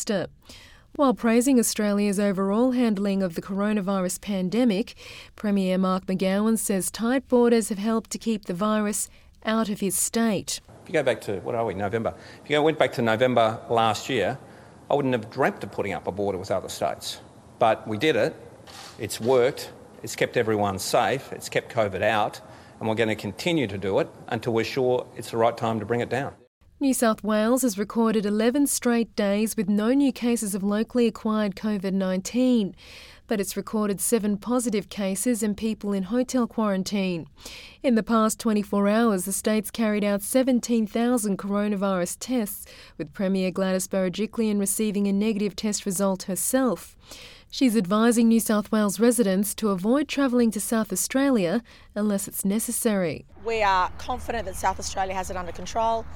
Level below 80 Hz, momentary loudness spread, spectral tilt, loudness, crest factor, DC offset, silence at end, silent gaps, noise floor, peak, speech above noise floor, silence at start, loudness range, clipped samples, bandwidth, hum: -54 dBFS; 10 LU; -4.5 dB/octave; -24 LUFS; 22 dB; under 0.1%; 0 s; 26.47-26.61 s; -44 dBFS; -4 dBFS; 20 dB; 0 s; 3 LU; under 0.1%; 18 kHz; none